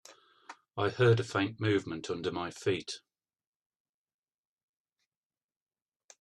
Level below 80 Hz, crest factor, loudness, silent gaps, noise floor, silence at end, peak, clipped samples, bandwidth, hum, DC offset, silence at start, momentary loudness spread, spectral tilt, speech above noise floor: -72 dBFS; 22 dB; -31 LUFS; none; under -90 dBFS; 3.25 s; -14 dBFS; under 0.1%; 11 kHz; none; under 0.1%; 0.1 s; 14 LU; -6 dB/octave; over 59 dB